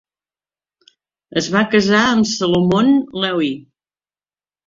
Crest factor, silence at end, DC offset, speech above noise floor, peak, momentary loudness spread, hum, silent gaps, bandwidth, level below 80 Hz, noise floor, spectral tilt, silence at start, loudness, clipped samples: 18 dB; 1.05 s; under 0.1%; over 75 dB; 0 dBFS; 9 LU; none; none; 7.6 kHz; -54 dBFS; under -90 dBFS; -5 dB/octave; 1.35 s; -16 LUFS; under 0.1%